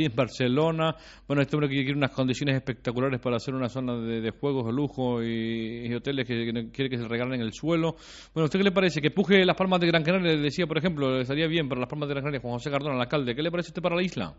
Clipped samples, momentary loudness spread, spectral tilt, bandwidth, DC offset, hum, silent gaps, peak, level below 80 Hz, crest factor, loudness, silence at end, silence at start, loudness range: under 0.1%; 8 LU; -5 dB/octave; 8 kHz; under 0.1%; none; none; -8 dBFS; -56 dBFS; 20 dB; -27 LUFS; 0.05 s; 0 s; 5 LU